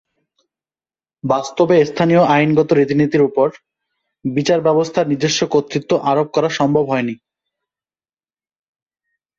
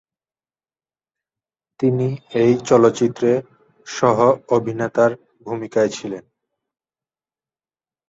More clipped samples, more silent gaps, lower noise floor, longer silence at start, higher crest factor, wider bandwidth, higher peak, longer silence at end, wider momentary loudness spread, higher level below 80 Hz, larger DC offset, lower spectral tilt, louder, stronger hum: neither; neither; about the same, under -90 dBFS vs under -90 dBFS; second, 1.25 s vs 1.8 s; about the same, 16 dB vs 18 dB; about the same, 7.8 kHz vs 7.8 kHz; about the same, -2 dBFS vs -2 dBFS; first, 2.25 s vs 1.9 s; second, 7 LU vs 15 LU; about the same, -58 dBFS vs -60 dBFS; neither; about the same, -5.5 dB/octave vs -6.5 dB/octave; about the same, -16 LUFS vs -18 LUFS; neither